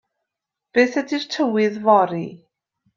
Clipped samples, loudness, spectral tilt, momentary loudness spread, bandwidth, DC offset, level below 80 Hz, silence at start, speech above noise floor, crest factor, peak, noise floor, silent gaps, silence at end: under 0.1%; -19 LUFS; -5.5 dB/octave; 10 LU; 7.4 kHz; under 0.1%; -68 dBFS; 0.75 s; 65 dB; 18 dB; -4 dBFS; -84 dBFS; none; 0.6 s